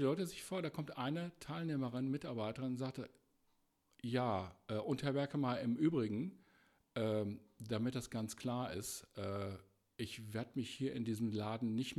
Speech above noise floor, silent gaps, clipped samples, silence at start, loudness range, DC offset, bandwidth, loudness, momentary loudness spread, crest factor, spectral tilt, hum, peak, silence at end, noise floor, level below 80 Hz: 38 dB; none; under 0.1%; 0 s; 4 LU; under 0.1%; 14.5 kHz; -41 LUFS; 9 LU; 18 dB; -6 dB/octave; none; -24 dBFS; 0 s; -78 dBFS; -74 dBFS